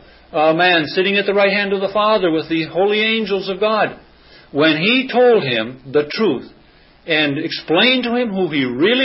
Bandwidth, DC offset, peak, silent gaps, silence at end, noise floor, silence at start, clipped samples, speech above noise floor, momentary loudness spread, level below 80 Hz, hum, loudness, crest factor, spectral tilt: 5.8 kHz; under 0.1%; -2 dBFS; none; 0 s; -48 dBFS; 0.35 s; under 0.1%; 32 dB; 7 LU; -56 dBFS; none; -16 LUFS; 14 dB; -9 dB/octave